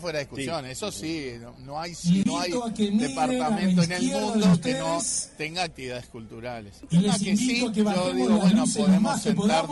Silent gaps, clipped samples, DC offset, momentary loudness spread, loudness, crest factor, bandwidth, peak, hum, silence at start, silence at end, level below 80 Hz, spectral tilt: none; under 0.1%; under 0.1%; 15 LU; -24 LUFS; 12 dB; 11.5 kHz; -12 dBFS; none; 0 s; 0 s; -54 dBFS; -5 dB/octave